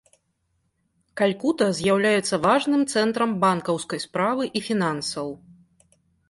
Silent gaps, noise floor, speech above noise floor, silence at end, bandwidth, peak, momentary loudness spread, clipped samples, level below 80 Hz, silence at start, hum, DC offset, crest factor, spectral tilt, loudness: none; -72 dBFS; 49 dB; 0.9 s; 11.5 kHz; -8 dBFS; 9 LU; under 0.1%; -64 dBFS; 1.15 s; none; under 0.1%; 16 dB; -4.5 dB/octave; -23 LUFS